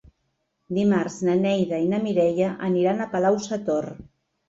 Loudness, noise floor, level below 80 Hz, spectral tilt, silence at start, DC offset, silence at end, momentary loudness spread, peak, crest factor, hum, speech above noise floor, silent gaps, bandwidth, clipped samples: -23 LUFS; -74 dBFS; -60 dBFS; -6.5 dB/octave; 0.7 s; under 0.1%; 0.45 s; 5 LU; -10 dBFS; 14 dB; none; 52 dB; none; 7.8 kHz; under 0.1%